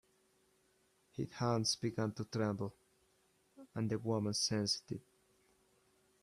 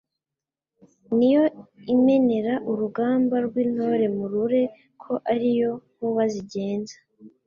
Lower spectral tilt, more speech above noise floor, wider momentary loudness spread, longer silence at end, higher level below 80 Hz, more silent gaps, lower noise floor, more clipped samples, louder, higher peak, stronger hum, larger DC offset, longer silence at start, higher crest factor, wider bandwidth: second, -4.5 dB/octave vs -7.5 dB/octave; second, 37 dB vs 66 dB; first, 13 LU vs 10 LU; first, 1.2 s vs 0.2 s; second, -74 dBFS vs -68 dBFS; neither; second, -75 dBFS vs -89 dBFS; neither; second, -38 LUFS vs -23 LUFS; second, -22 dBFS vs -10 dBFS; neither; neither; about the same, 1.15 s vs 1.1 s; first, 20 dB vs 14 dB; first, 14 kHz vs 7.2 kHz